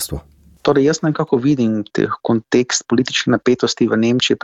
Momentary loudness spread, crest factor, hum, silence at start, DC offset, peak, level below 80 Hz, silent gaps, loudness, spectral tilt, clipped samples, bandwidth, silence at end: 5 LU; 14 dB; none; 0 s; under 0.1%; -2 dBFS; -46 dBFS; none; -17 LUFS; -4.5 dB/octave; under 0.1%; 15 kHz; 0.05 s